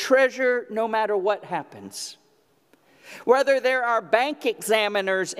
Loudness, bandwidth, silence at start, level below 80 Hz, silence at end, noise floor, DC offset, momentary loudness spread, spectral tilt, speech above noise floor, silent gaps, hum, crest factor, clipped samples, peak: -23 LUFS; 15.5 kHz; 0 s; -80 dBFS; 0 s; -63 dBFS; under 0.1%; 15 LU; -3 dB/octave; 40 dB; none; none; 20 dB; under 0.1%; -4 dBFS